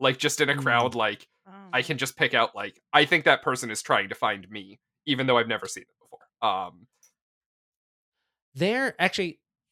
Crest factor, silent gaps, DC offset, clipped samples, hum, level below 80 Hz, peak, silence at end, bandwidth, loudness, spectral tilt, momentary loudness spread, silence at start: 24 dB; 7.22-8.12 s, 8.42-8.52 s; under 0.1%; under 0.1%; none; -72 dBFS; -2 dBFS; 0.4 s; 17.5 kHz; -25 LUFS; -3.5 dB/octave; 16 LU; 0 s